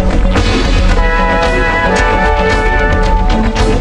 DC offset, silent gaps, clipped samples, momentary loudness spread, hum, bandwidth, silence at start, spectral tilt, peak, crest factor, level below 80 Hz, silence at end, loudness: under 0.1%; none; under 0.1%; 2 LU; none; 10 kHz; 0 s; -5.5 dB/octave; 0 dBFS; 10 dB; -12 dBFS; 0 s; -12 LUFS